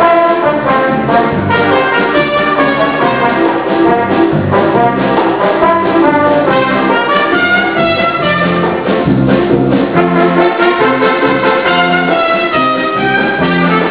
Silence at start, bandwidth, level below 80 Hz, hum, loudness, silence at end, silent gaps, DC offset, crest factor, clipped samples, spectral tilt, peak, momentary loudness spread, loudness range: 0 s; 4 kHz; -38 dBFS; none; -10 LUFS; 0 s; none; 0.4%; 10 dB; 0.2%; -9.5 dB/octave; 0 dBFS; 2 LU; 1 LU